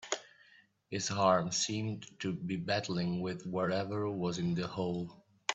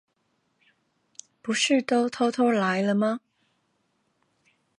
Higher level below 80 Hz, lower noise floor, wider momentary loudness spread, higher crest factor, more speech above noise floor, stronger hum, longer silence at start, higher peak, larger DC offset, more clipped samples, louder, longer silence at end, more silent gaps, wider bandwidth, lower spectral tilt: first, -70 dBFS vs -76 dBFS; second, -64 dBFS vs -73 dBFS; first, 11 LU vs 7 LU; about the same, 20 dB vs 16 dB; second, 30 dB vs 49 dB; neither; second, 0 s vs 1.45 s; second, -14 dBFS vs -10 dBFS; neither; neither; second, -35 LUFS vs -24 LUFS; second, 0 s vs 1.6 s; neither; second, 8.4 kHz vs 11 kHz; about the same, -4.5 dB/octave vs -4 dB/octave